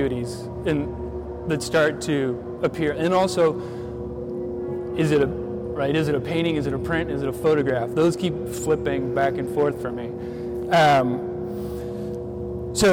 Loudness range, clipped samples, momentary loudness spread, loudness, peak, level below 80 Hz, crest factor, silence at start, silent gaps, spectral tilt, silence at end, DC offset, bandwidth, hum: 2 LU; under 0.1%; 10 LU; -24 LUFS; -10 dBFS; -44 dBFS; 12 dB; 0 s; none; -5.5 dB/octave; 0 s; under 0.1%; 16.5 kHz; none